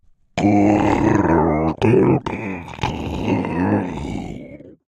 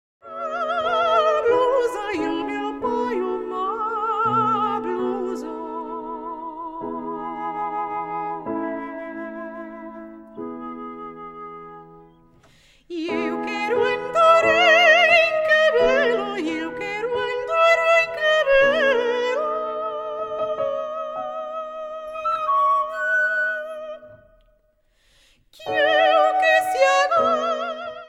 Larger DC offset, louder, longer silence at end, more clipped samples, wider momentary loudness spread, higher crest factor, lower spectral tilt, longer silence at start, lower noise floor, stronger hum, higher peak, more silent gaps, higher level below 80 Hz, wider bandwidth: neither; about the same, -19 LUFS vs -20 LUFS; first, 0.15 s vs 0 s; neither; second, 14 LU vs 18 LU; about the same, 18 dB vs 18 dB; first, -7.5 dB/octave vs -3.5 dB/octave; about the same, 0.35 s vs 0.25 s; second, -38 dBFS vs -63 dBFS; neither; about the same, -2 dBFS vs -4 dBFS; neither; first, -38 dBFS vs -56 dBFS; second, 9.2 kHz vs 13.5 kHz